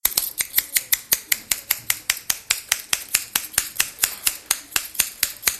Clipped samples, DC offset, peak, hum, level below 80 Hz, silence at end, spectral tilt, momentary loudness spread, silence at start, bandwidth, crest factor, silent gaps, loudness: under 0.1%; under 0.1%; 0 dBFS; none; -54 dBFS; 0 s; 2 dB/octave; 3 LU; 0.05 s; over 20 kHz; 24 dB; none; -21 LUFS